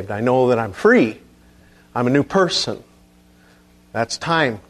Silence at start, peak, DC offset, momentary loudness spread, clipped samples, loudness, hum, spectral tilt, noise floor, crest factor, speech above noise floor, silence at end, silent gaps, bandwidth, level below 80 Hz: 0 s; -2 dBFS; under 0.1%; 12 LU; under 0.1%; -18 LUFS; 60 Hz at -45 dBFS; -5 dB/octave; -51 dBFS; 18 dB; 33 dB; 0.1 s; none; 13 kHz; -54 dBFS